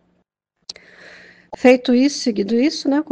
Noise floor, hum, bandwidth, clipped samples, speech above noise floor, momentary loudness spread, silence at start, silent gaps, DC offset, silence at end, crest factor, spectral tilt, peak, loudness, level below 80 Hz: -69 dBFS; none; 9.6 kHz; under 0.1%; 53 dB; 24 LU; 1.5 s; none; under 0.1%; 0 s; 18 dB; -4 dB/octave; 0 dBFS; -17 LUFS; -62 dBFS